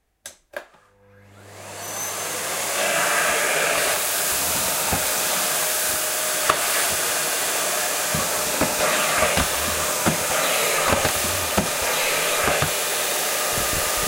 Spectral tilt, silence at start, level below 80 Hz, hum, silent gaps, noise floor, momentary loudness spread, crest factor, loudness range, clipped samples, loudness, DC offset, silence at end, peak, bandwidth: -1 dB/octave; 0.25 s; -46 dBFS; none; none; -54 dBFS; 6 LU; 22 dB; 2 LU; under 0.1%; -20 LUFS; under 0.1%; 0 s; 0 dBFS; 16 kHz